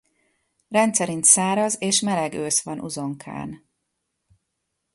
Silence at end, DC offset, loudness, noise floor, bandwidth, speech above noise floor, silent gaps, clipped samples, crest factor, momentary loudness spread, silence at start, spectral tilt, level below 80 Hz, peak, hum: 1.4 s; under 0.1%; -20 LUFS; -78 dBFS; 12 kHz; 56 dB; none; under 0.1%; 22 dB; 18 LU; 0.7 s; -2.5 dB/octave; -64 dBFS; -2 dBFS; none